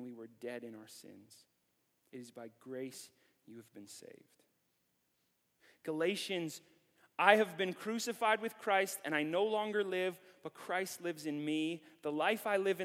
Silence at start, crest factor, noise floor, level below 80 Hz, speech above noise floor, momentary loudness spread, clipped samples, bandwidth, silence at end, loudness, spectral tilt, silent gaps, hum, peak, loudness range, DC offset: 0 s; 28 dB; -80 dBFS; under -90 dBFS; 43 dB; 20 LU; under 0.1%; 17 kHz; 0 s; -36 LUFS; -3.5 dB/octave; none; none; -10 dBFS; 18 LU; under 0.1%